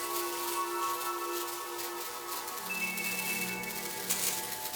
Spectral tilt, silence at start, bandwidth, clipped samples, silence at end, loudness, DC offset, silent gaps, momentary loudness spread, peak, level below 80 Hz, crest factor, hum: -1.5 dB/octave; 0 s; over 20 kHz; under 0.1%; 0 s; -33 LUFS; under 0.1%; none; 6 LU; -12 dBFS; -70 dBFS; 22 dB; none